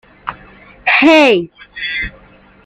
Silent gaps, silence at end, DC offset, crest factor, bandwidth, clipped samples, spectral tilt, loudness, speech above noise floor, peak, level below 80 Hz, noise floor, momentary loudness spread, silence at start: none; 0.55 s; under 0.1%; 14 dB; 9.6 kHz; under 0.1%; -4.5 dB/octave; -11 LUFS; 29 dB; 0 dBFS; -42 dBFS; -41 dBFS; 21 LU; 0.25 s